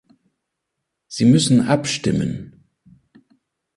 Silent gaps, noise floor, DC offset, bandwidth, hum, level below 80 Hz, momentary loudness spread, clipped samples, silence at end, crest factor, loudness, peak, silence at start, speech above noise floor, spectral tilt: none; -79 dBFS; under 0.1%; 11.5 kHz; none; -50 dBFS; 15 LU; under 0.1%; 1.3 s; 18 dB; -18 LUFS; -2 dBFS; 1.1 s; 62 dB; -5.5 dB/octave